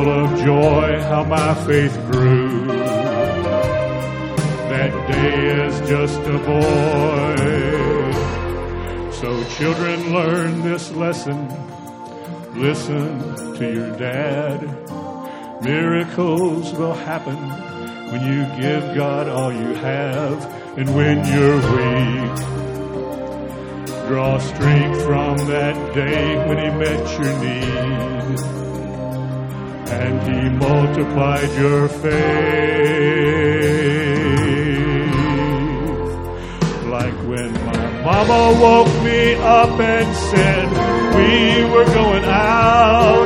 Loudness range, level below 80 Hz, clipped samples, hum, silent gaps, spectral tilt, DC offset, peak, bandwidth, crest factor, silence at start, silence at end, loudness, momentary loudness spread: 8 LU; -34 dBFS; under 0.1%; none; none; -6.5 dB/octave; under 0.1%; 0 dBFS; 16 kHz; 16 dB; 0 s; 0 s; -17 LUFS; 13 LU